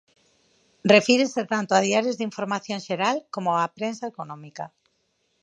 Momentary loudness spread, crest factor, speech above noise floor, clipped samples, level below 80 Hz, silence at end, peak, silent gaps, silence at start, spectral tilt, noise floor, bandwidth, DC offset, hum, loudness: 19 LU; 24 dB; 48 dB; under 0.1%; -74 dBFS; 0.75 s; -2 dBFS; none; 0.85 s; -4 dB/octave; -71 dBFS; 10 kHz; under 0.1%; none; -23 LUFS